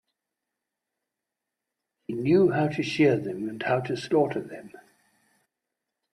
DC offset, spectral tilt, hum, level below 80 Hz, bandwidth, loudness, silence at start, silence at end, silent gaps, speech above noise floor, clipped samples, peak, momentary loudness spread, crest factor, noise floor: under 0.1%; -7 dB/octave; none; -66 dBFS; 11 kHz; -25 LUFS; 2.1 s; 1.35 s; none; 61 dB; under 0.1%; -10 dBFS; 16 LU; 18 dB; -86 dBFS